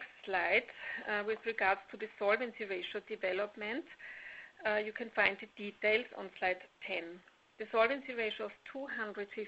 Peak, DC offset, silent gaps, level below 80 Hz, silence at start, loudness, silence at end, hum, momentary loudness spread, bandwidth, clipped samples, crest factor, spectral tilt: -12 dBFS; under 0.1%; none; -74 dBFS; 0 s; -36 LUFS; 0 s; none; 14 LU; 8 kHz; under 0.1%; 26 dB; -0.5 dB/octave